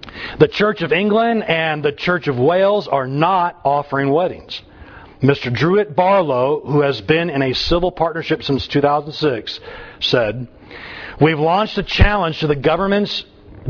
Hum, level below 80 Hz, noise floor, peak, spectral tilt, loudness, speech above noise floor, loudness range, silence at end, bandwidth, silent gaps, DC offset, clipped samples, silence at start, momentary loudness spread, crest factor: none; -32 dBFS; -39 dBFS; 0 dBFS; -7 dB/octave; -17 LUFS; 23 dB; 2 LU; 0 s; 5.4 kHz; none; under 0.1%; under 0.1%; 0.05 s; 14 LU; 18 dB